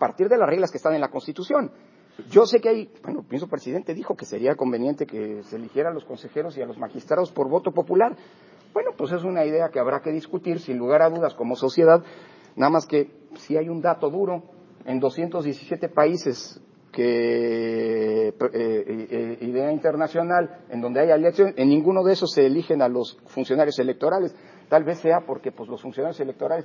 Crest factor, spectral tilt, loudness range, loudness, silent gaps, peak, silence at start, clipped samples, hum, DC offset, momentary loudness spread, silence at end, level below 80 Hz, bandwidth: 20 dB; -6.5 dB/octave; 6 LU; -23 LUFS; none; -2 dBFS; 0 s; under 0.1%; none; under 0.1%; 13 LU; 0 s; -76 dBFS; 7.4 kHz